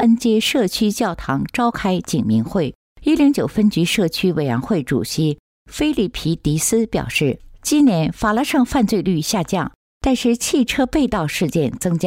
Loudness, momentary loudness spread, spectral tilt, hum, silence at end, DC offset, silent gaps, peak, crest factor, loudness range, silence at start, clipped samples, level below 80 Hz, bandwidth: -18 LUFS; 7 LU; -5 dB/octave; none; 0 s; under 0.1%; 2.75-2.96 s, 5.39-5.66 s, 9.75-10.00 s; -6 dBFS; 12 dB; 2 LU; 0 s; under 0.1%; -40 dBFS; 16 kHz